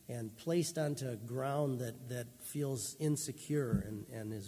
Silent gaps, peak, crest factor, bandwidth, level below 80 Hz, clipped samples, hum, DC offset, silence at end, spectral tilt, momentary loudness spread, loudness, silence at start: none; -22 dBFS; 16 dB; 16 kHz; -60 dBFS; under 0.1%; none; under 0.1%; 0 s; -5.5 dB/octave; 9 LU; -38 LUFS; 0.05 s